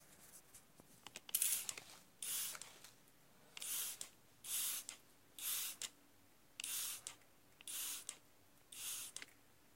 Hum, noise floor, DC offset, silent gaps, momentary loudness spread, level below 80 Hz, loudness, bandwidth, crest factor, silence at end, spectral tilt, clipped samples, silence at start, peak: none; -71 dBFS; under 0.1%; none; 20 LU; -84 dBFS; -44 LUFS; 16.5 kHz; 30 dB; 0.1 s; 1.5 dB/octave; under 0.1%; 0 s; -18 dBFS